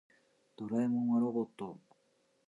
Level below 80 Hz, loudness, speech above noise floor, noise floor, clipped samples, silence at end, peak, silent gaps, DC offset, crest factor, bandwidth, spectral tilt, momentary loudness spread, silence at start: -82 dBFS; -34 LUFS; 41 dB; -74 dBFS; under 0.1%; 0.7 s; -22 dBFS; none; under 0.1%; 14 dB; 7.6 kHz; -9 dB/octave; 15 LU; 0.6 s